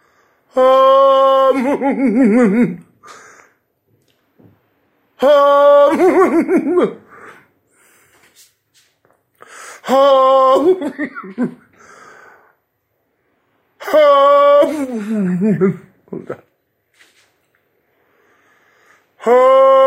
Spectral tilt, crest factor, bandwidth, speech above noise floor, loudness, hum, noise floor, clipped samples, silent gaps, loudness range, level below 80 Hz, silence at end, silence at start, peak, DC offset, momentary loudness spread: -6.5 dB/octave; 14 dB; 15 kHz; 55 dB; -12 LUFS; none; -67 dBFS; under 0.1%; none; 9 LU; -64 dBFS; 0 s; 0.55 s; -2 dBFS; under 0.1%; 20 LU